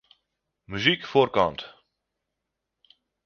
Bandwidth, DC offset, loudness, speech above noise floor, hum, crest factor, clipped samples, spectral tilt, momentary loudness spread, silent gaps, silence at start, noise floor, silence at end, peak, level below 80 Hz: 6.8 kHz; under 0.1%; -23 LUFS; 60 dB; none; 24 dB; under 0.1%; -5.5 dB/octave; 18 LU; none; 0.7 s; -83 dBFS; 1.55 s; -4 dBFS; -58 dBFS